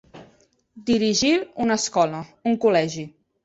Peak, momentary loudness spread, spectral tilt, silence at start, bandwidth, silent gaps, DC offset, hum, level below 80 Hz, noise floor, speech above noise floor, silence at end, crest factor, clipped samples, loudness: -6 dBFS; 12 LU; -4 dB/octave; 0.15 s; 8.2 kHz; none; under 0.1%; none; -58 dBFS; -59 dBFS; 37 dB; 0.35 s; 18 dB; under 0.1%; -21 LUFS